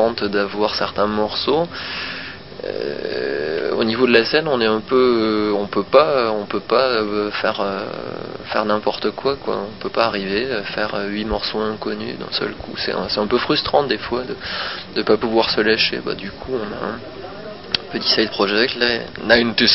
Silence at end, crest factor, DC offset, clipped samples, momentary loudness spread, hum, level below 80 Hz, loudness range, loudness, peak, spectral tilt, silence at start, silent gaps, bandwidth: 0 s; 20 dB; 0.5%; under 0.1%; 11 LU; none; -46 dBFS; 5 LU; -19 LUFS; 0 dBFS; -7.5 dB/octave; 0 s; none; 5.8 kHz